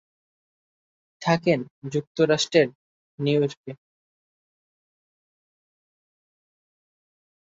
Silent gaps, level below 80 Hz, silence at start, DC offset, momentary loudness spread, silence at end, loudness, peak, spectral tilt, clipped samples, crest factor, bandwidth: 1.70-1.82 s, 2.07-2.15 s, 2.75-3.18 s, 3.57-3.64 s; -68 dBFS; 1.2 s; under 0.1%; 10 LU; 3.75 s; -24 LUFS; -4 dBFS; -5.5 dB/octave; under 0.1%; 24 dB; 8 kHz